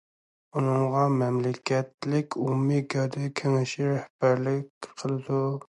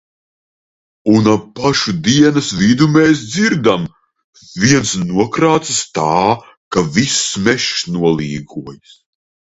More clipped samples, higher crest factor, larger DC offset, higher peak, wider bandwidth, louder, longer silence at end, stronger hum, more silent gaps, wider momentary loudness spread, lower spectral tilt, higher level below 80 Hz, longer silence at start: neither; about the same, 16 dB vs 14 dB; neither; second, -10 dBFS vs 0 dBFS; first, 10.5 kHz vs 8.2 kHz; second, -27 LUFS vs -14 LUFS; second, 0.2 s vs 0.7 s; neither; about the same, 1.94-1.98 s, 4.10-4.19 s, 4.70-4.81 s vs 4.24-4.33 s, 6.57-6.71 s; second, 8 LU vs 11 LU; first, -7 dB/octave vs -4.5 dB/octave; second, -72 dBFS vs -46 dBFS; second, 0.55 s vs 1.05 s